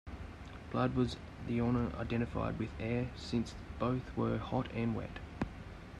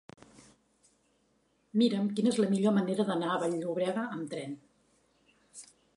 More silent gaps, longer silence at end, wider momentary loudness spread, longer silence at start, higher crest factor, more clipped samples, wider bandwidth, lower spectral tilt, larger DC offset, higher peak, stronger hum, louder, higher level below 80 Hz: neither; second, 0 s vs 0.3 s; second, 12 LU vs 21 LU; second, 0.05 s vs 1.75 s; about the same, 16 dB vs 18 dB; neither; about the same, 10.5 kHz vs 11.5 kHz; first, -7.5 dB/octave vs -6 dB/octave; neither; second, -20 dBFS vs -14 dBFS; neither; second, -37 LUFS vs -30 LUFS; first, -50 dBFS vs -78 dBFS